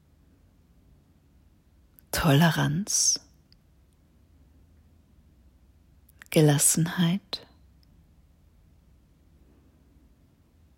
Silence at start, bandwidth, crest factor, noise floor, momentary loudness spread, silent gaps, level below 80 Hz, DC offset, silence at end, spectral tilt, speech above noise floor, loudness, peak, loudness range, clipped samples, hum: 2.15 s; 16 kHz; 22 dB; -60 dBFS; 12 LU; none; -54 dBFS; under 0.1%; 3.4 s; -4 dB/octave; 38 dB; -23 LUFS; -8 dBFS; 7 LU; under 0.1%; none